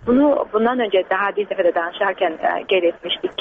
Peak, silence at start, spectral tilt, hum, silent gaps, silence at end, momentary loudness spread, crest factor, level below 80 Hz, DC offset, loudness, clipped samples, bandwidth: -6 dBFS; 0 s; -1.5 dB/octave; none; none; 0.1 s; 5 LU; 12 dB; -54 dBFS; under 0.1%; -19 LUFS; under 0.1%; 4.7 kHz